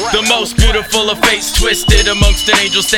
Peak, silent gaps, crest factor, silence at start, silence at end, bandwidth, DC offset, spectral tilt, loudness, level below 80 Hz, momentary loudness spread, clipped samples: 0 dBFS; none; 12 dB; 0 s; 0 s; 18.5 kHz; under 0.1%; -2.5 dB/octave; -11 LUFS; -16 dBFS; 3 LU; under 0.1%